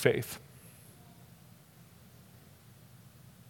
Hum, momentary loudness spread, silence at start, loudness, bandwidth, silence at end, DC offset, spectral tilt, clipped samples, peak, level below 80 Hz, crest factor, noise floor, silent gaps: none; 17 LU; 0 s; -35 LUFS; 18 kHz; 2.8 s; under 0.1%; -5 dB/octave; under 0.1%; -8 dBFS; -72 dBFS; 30 dB; -57 dBFS; none